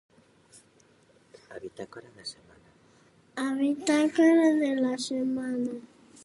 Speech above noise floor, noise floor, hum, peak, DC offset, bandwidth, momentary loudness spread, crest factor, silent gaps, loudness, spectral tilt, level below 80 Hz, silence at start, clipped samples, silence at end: 35 dB; -62 dBFS; none; -12 dBFS; under 0.1%; 11.5 kHz; 22 LU; 18 dB; none; -26 LUFS; -4 dB/octave; -74 dBFS; 1.5 s; under 0.1%; 0.45 s